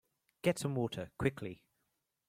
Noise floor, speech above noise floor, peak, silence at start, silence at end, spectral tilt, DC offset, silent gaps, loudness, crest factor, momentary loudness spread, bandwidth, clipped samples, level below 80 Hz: -83 dBFS; 47 dB; -16 dBFS; 0.45 s; 0.75 s; -6 dB/octave; under 0.1%; none; -37 LUFS; 22 dB; 13 LU; 16 kHz; under 0.1%; -62 dBFS